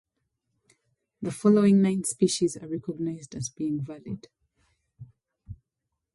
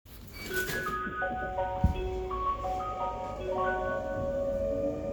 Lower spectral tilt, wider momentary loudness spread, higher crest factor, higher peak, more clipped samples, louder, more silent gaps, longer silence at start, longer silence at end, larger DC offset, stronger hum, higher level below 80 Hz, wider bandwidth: about the same, -6 dB/octave vs -5.5 dB/octave; first, 17 LU vs 4 LU; about the same, 18 dB vs 20 dB; about the same, -10 dBFS vs -12 dBFS; neither; first, -26 LUFS vs -33 LUFS; neither; first, 1.2 s vs 0.05 s; first, 0.6 s vs 0 s; neither; neither; second, -62 dBFS vs -42 dBFS; second, 11.5 kHz vs over 20 kHz